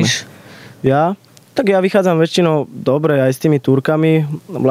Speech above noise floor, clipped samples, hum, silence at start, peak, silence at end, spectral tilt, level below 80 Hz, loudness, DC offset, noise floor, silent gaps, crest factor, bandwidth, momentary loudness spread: 25 dB; under 0.1%; none; 0 s; -2 dBFS; 0 s; -6 dB/octave; -58 dBFS; -15 LUFS; under 0.1%; -38 dBFS; none; 12 dB; 15.5 kHz; 7 LU